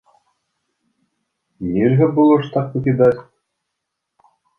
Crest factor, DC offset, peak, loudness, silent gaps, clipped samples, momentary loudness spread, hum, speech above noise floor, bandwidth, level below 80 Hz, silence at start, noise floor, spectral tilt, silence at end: 18 dB; under 0.1%; -2 dBFS; -16 LUFS; none; under 0.1%; 11 LU; none; 63 dB; 4.4 kHz; -54 dBFS; 1.6 s; -78 dBFS; -10.5 dB/octave; 1.35 s